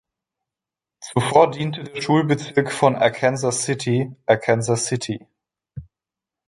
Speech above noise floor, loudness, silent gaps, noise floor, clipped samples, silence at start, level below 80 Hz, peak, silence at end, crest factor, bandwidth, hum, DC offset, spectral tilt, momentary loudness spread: 68 dB; -20 LUFS; none; -88 dBFS; under 0.1%; 1 s; -56 dBFS; -2 dBFS; 0.65 s; 20 dB; 11.5 kHz; none; under 0.1%; -5 dB/octave; 17 LU